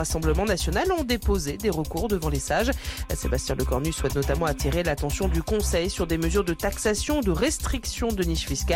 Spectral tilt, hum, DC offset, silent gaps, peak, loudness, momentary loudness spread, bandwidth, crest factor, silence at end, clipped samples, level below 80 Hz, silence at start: -4.5 dB/octave; none; under 0.1%; none; -12 dBFS; -26 LUFS; 3 LU; 17 kHz; 14 dB; 0 s; under 0.1%; -30 dBFS; 0 s